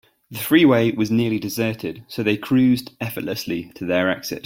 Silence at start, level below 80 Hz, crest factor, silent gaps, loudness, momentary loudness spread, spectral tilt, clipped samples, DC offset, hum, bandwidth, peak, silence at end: 0.3 s; -58 dBFS; 18 dB; none; -20 LUFS; 13 LU; -5.5 dB/octave; under 0.1%; under 0.1%; none; 17 kHz; -2 dBFS; 0.05 s